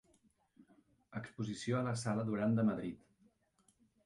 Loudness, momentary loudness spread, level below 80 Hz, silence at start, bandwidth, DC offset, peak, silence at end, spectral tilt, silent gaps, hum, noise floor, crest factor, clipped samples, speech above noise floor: -38 LUFS; 15 LU; -72 dBFS; 0.6 s; 11.5 kHz; under 0.1%; -24 dBFS; 1.1 s; -6.5 dB/octave; none; none; -75 dBFS; 16 dB; under 0.1%; 39 dB